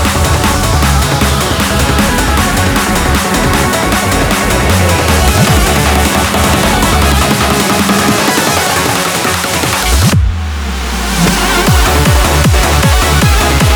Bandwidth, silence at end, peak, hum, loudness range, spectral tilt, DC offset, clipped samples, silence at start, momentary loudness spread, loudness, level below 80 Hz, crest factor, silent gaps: over 20 kHz; 0 s; 0 dBFS; none; 2 LU; -4 dB/octave; under 0.1%; under 0.1%; 0 s; 3 LU; -10 LUFS; -16 dBFS; 10 dB; none